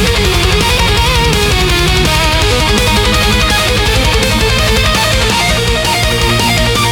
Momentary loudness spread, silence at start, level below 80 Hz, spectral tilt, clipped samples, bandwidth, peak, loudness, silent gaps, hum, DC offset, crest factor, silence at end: 1 LU; 0 s; -16 dBFS; -3.5 dB/octave; under 0.1%; 18 kHz; 0 dBFS; -10 LUFS; none; none; under 0.1%; 10 dB; 0 s